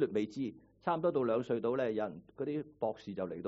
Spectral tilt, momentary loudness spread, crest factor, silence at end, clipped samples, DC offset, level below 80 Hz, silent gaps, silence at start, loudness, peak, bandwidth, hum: -6.5 dB/octave; 9 LU; 18 dB; 0 s; under 0.1%; under 0.1%; -72 dBFS; none; 0 s; -36 LUFS; -18 dBFS; 7.6 kHz; none